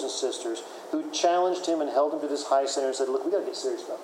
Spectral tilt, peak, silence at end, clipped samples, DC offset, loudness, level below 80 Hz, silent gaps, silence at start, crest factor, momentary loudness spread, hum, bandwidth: -2 dB/octave; -10 dBFS; 0 s; under 0.1%; under 0.1%; -27 LUFS; under -90 dBFS; none; 0 s; 18 dB; 9 LU; none; 16 kHz